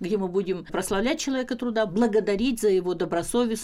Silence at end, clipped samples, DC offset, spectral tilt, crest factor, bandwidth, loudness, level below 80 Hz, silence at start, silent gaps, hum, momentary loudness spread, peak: 0 s; under 0.1%; under 0.1%; -4.5 dB/octave; 14 dB; 15.5 kHz; -25 LUFS; -48 dBFS; 0 s; none; none; 5 LU; -12 dBFS